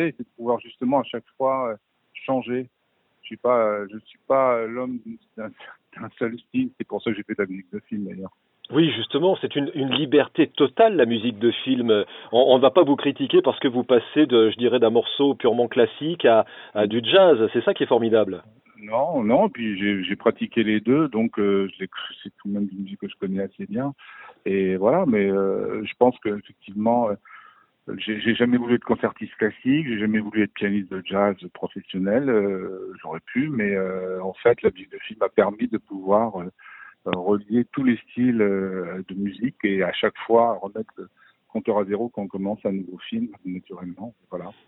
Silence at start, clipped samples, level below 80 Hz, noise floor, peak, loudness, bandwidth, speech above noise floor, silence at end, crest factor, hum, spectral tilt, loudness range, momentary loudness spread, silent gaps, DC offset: 0 s; under 0.1%; -64 dBFS; -55 dBFS; -2 dBFS; -22 LUFS; 4.1 kHz; 33 dB; 0.15 s; 22 dB; none; -10.5 dB/octave; 8 LU; 16 LU; none; under 0.1%